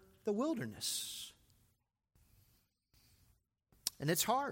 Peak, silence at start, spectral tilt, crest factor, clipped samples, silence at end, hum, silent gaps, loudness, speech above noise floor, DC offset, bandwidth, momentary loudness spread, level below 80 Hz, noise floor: -16 dBFS; 0.25 s; -3.5 dB/octave; 26 dB; under 0.1%; 0 s; none; none; -38 LUFS; 43 dB; under 0.1%; 16.5 kHz; 11 LU; -74 dBFS; -80 dBFS